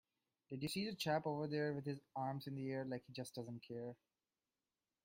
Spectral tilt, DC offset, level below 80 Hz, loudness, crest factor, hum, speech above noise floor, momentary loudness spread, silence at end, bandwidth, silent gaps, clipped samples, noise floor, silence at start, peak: -5.5 dB/octave; under 0.1%; -82 dBFS; -45 LUFS; 20 dB; none; over 46 dB; 10 LU; 1.1 s; 16 kHz; none; under 0.1%; under -90 dBFS; 0.5 s; -26 dBFS